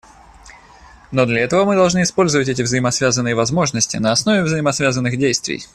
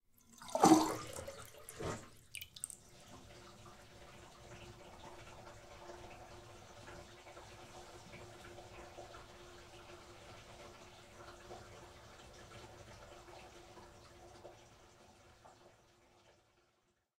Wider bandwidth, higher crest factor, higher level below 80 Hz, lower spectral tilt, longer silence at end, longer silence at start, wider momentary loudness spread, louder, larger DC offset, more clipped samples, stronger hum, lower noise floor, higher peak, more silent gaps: second, 13 kHz vs 16 kHz; second, 16 dB vs 32 dB; first, -48 dBFS vs -68 dBFS; about the same, -4 dB/octave vs -4.5 dB/octave; second, 0.1 s vs 0.85 s; first, 0.45 s vs 0.25 s; second, 3 LU vs 13 LU; first, -16 LUFS vs -37 LUFS; neither; neither; neither; second, -44 dBFS vs -79 dBFS; first, -2 dBFS vs -12 dBFS; neither